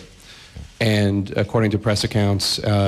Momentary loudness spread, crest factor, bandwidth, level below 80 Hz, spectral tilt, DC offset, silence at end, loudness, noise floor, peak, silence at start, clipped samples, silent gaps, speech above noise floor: 17 LU; 14 dB; 14 kHz; -46 dBFS; -5.5 dB/octave; under 0.1%; 0 s; -20 LUFS; -44 dBFS; -8 dBFS; 0 s; under 0.1%; none; 25 dB